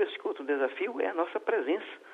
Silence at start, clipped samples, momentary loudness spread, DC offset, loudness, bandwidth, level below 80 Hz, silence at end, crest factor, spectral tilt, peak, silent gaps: 0 s; under 0.1%; 3 LU; under 0.1%; -31 LUFS; 6.4 kHz; -86 dBFS; 0 s; 18 dB; -4.5 dB/octave; -14 dBFS; none